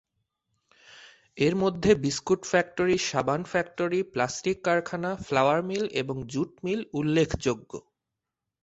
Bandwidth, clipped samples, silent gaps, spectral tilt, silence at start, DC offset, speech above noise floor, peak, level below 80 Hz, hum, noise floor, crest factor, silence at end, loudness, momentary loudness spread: 8.2 kHz; under 0.1%; none; -5 dB/octave; 0.95 s; under 0.1%; 60 dB; -8 dBFS; -54 dBFS; none; -86 dBFS; 20 dB; 0.8 s; -27 LUFS; 8 LU